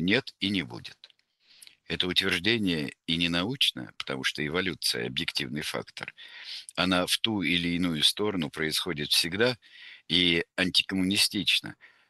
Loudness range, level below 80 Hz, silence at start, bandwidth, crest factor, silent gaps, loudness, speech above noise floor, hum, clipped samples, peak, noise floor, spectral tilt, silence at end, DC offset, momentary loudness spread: 4 LU; -60 dBFS; 0 s; 13 kHz; 22 dB; none; -26 LUFS; 34 dB; none; under 0.1%; -6 dBFS; -63 dBFS; -3.5 dB/octave; 0.25 s; under 0.1%; 15 LU